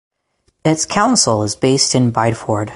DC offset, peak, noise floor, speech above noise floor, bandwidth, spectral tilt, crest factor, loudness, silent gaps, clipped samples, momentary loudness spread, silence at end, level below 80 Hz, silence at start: under 0.1%; 0 dBFS; -64 dBFS; 49 dB; 11.5 kHz; -4 dB/octave; 16 dB; -15 LUFS; none; under 0.1%; 6 LU; 0 s; -48 dBFS; 0.65 s